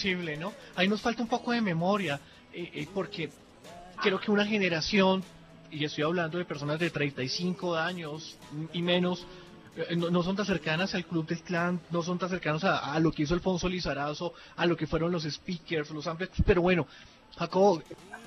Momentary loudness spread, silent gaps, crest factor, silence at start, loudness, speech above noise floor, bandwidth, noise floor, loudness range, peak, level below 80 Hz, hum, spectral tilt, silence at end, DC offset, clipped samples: 14 LU; none; 20 dB; 0 s; -30 LUFS; 19 dB; 11 kHz; -49 dBFS; 3 LU; -10 dBFS; -48 dBFS; none; -5.5 dB/octave; 0 s; under 0.1%; under 0.1%